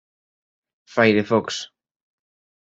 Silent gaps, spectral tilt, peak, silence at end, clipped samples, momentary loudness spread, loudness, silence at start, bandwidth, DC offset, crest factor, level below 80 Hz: none; -5 dB/octave; -2 dBFS; 1 s; under 0.1%; 13 LU; -20 LUFS; 0.95 s; 8 kHz; under 0.1%; 22 dB; -64 dBFS